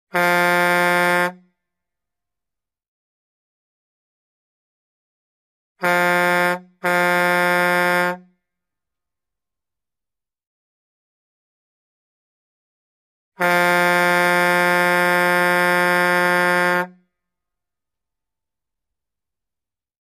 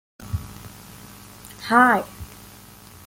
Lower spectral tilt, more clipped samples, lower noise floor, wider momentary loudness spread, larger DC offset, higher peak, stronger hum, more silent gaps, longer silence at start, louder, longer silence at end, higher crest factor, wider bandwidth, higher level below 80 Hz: about the same, -4 dB/octave vs -5 dB/octave; neither; first, -90 dBFS vs -45 dBFS; second, 6 LU vs 26 LU; neither; about the same, -6 dBFS vs -4 dBFS; neither; first, 2.88-5.75 s, 10.47-13.32 s vs none; about the same, 0.15 s vs 0.2 s; first, -17 LUFS vs -20 LUFS; first, 3.15 s vs 0.8 s; second, 16 dB vs 22 dB; about the same, 16 kHz vs 17 kHz; second, -70 dBFS vs -48 dBFS